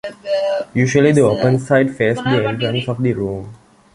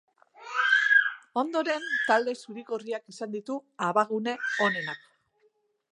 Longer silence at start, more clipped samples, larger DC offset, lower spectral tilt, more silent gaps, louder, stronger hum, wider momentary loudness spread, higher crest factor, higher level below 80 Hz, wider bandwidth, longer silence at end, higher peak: second, 0.05 s vs 0.4 s; neither; neither; first, -6.5 dB/octave vs -3.5 dB/octave; neither; first, -16 LUFS vs -27 LUFS; neither; second, 9 LU vs 15 LU; about the same, 16 dB vs 20 dB; first, -48 dBFS vs -88 dBFS; about the same, 11.5 kHz vs 11 kHz; second, 0.4 s vs 0.95 s; first, 0 dBFS vs -8 dBFS